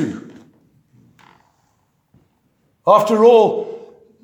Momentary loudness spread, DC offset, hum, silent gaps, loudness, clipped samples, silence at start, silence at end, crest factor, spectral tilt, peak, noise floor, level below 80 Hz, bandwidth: 22 LU; under 0.1%; none; none; -14 LUFS; under 0.1%; 0 s; 0.45 s; 18 dB; -6 dB/octave; 0 dBFS; -63 dBFS; -70 dBFS; 18.5 kHz